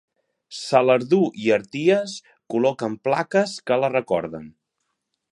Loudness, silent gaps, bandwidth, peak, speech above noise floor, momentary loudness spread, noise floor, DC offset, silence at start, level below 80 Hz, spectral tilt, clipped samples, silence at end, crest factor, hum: -21 LUFS; none; 11.5 kHz; -2 dBFS; 56 dB; 15 LU; -77 dBFS; under 0.1%; 0.5 s; -66 dBFS; -5.5 dB/octave; under 0.1%; 0.8 s; 20 dB; none